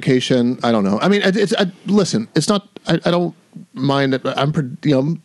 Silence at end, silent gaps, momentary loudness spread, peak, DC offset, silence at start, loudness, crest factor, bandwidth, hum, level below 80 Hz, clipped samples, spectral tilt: 0.05 s; none; 5 LU; -2 dBFS; under 0.1%; 0 s; -17 LUFS; 14 dB; 12 kHz; none; -58 dBFS; under 0.1%; -5.5 dB/octave